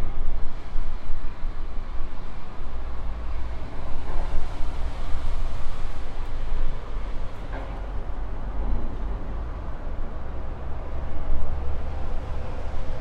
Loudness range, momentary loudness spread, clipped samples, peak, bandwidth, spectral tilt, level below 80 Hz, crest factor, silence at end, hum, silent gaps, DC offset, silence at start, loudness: 2 LU; 5 LU; under 0.1%; -8 dBFS; 4.2 kHz; -7 dB/octave; -26 dBFS; 12 dB; 0 s; none; none; under 0.1%; 0 s; -35 LUFS